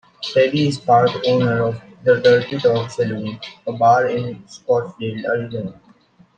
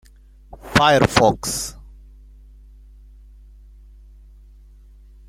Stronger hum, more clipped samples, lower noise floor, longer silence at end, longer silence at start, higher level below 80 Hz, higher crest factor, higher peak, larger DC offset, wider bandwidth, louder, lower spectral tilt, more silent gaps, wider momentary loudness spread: second, none vs 50 Hz at -45 dBFS; neither; first, -52 dBFS vs -47 dBFS; second, 0.65 s vs 3.55 s; second, 0.2 s vs 0.5 s; second, -58 dBFS vs -42 dBFS; second, 16 dB vs 24 dB; about the same, -2 dBFS vs 0 dBFS; neither; second, 9.2 kHz vs 16.5 kHz; about the same, -18 LUFS vs -17 LUFS; first, -6.5 dB/octave vs -4 dB/octave; neither; about the same, 14 LU vs 15 LU